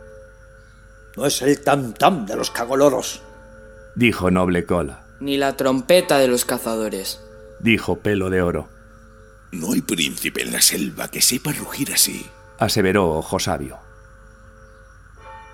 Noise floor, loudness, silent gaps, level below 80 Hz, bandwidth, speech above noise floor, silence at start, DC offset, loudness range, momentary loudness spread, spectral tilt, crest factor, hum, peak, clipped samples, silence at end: -46 dBFS; -19 LUFS; none; -46 dBFS; 18.5 kHz; 26 dB; 0 s; under 0.1%; 4 LU; 14 LU; -3.5 dB/octave; 22 dB; none; 0 dBFS; under 0.1%; 0 s